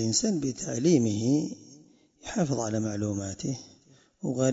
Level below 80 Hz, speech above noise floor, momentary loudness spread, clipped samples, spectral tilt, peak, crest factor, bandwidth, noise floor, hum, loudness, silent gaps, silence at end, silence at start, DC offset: -62 dBFS; 32 dB; 13 LU; under 0.1%; -5 dB/octave; -10 dBFS; 18 dB; 8 kHz; -59 dBFS; none; -28 LUFS; none; 0 s; 0 s; under 0.1%